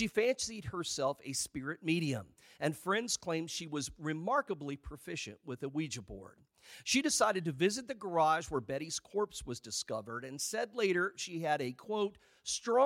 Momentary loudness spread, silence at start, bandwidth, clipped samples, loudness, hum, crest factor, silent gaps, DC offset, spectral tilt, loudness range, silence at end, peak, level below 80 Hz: 12 LU; 0 s; 16.5 kHz; under 0.1%; -36 LUFS; none; 20 dB; none; under 0.1%; -3.5 dB/octave; 4 LU; 0 s; -16 dBFS; -62 dBFS